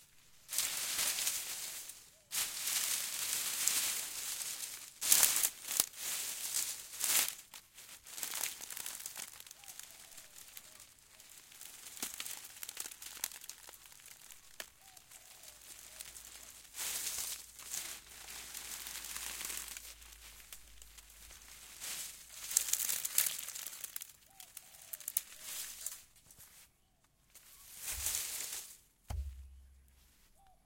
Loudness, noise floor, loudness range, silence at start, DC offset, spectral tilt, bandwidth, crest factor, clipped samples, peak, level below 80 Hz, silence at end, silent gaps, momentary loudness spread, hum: -36 LUFS; -72 dBFS; 15 LU; 0 s; under 0.1%; 1 dB/octave; 17 kHz; 38 dB; under 0.1%; -4 dBFS; -62 dBFS; 0.1 s; none; 21 LU; none